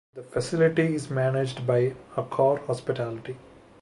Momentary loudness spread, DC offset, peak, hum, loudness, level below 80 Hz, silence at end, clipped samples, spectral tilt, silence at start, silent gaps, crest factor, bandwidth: 11 LU; under 0.1%; -10 dBFS; none; -26 LUFS; -62 dBFS; 0.4 s; under 0.1%; -7 dB/octave; 0.15 s; none; 16 dB; 11.5 kHz